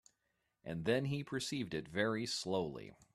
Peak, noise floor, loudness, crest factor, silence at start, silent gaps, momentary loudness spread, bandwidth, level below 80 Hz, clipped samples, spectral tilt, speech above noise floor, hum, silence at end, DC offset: -18 dBFS; -84 dBFS; -39 LUFS; 22 dB; 0.65 s; none; 10 LU; 13.5 kHz; -70 dBFS; under 0.1%; -5 dB/octave; 45 dB; none; 0.2 s; under 0.1%